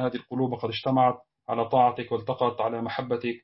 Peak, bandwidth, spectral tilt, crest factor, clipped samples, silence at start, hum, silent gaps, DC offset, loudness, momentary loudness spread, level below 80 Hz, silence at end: -10 dBFS; 5.8 kHz; -10.5 dB/octave; 18 dB; under 0.1%; 0 s; none; none; under 0.1%; -26 LUFS; 8 LU; -66 dBFS; 0.05 s